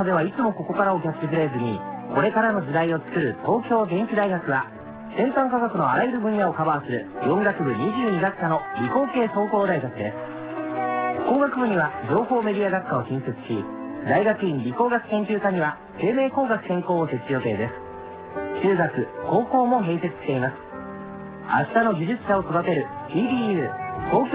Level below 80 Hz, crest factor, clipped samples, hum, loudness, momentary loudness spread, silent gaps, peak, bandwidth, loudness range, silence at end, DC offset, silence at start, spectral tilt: -56 dBFS; 16 dB; under 0.1%; none; -24 LUFS; 9 LU; none; -6 dBFS; 4 kHz; 1 LU; 0 s; under 0.1%; 0 s; -11 dB/octave